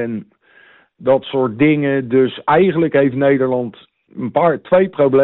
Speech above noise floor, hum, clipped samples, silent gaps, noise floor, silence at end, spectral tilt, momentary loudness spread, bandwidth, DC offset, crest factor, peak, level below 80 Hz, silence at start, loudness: 34 dB; none; under 0.1%; none; -49 dBFS; 0 s; -6 dB/octave; 11 LU; 4.1 kHz; under 0.1%; 12 dB; -4 dBFS; -54 dBFS; 0 s; -15 LUFS